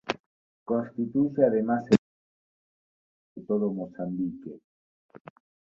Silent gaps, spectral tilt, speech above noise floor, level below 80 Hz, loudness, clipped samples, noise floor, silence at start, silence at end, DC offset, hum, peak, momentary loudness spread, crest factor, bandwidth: 0.20-0.66 s, 1.98-3.35 s, 4.64-5.09 s; -7.5 dB/octave; over 64 dB; -66 dBFS; -27 LUFS; under 0.1%; under -90 dBFS; 0.05 s; 0.5 s; under 0.1%; none; -6 dBFS; 18 LU; 24 dB; 7.8 kHz